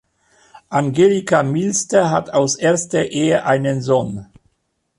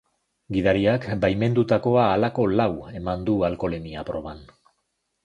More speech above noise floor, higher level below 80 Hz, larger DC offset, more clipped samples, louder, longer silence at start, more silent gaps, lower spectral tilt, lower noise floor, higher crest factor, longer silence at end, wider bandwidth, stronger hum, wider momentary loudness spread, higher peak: about the same, 52 dB vs 53 dB; second, -54 dBFS vs -46 dBFS; neither; neither; first, -17 LUFS vs -23 LUFS; about the same, 0.55 s vs 0.5 s; neither; second, -5 dB/octave vs -8.5 dB/octave; second, -68 dBFS vs -75 dBFS; about the same, 14 dB vs 18 dB; about the same, 0.75 s vs 0.8 s; about the same, 11.5 kHz vs 10.5 kHz; neither; second, 6 LU vs 12 LU; first, -2 dBFS vs -6 dBFS